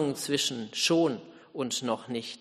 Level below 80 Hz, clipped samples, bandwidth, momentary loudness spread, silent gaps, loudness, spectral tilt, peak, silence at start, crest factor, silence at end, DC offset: -74 dBFS; under 0.1%; 13 kHz; 12 LU; none; -29 LUFS; -3.5 dB/octave; -14 dBFS; 0 s; 16 dB; 0.05 s; under 0.1%